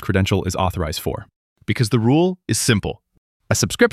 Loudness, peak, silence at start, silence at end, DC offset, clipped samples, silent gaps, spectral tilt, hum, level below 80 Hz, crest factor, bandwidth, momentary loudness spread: -20 LUFS; -2 dBFS; 0 s; 0.05 s; under 0.1%; under 0.1%; 1.36-1.56 s, 3.18-3.40 s; -5 dB/octave; none; -40 dBFS; 18 dB; 15.5 kHz; 13 LU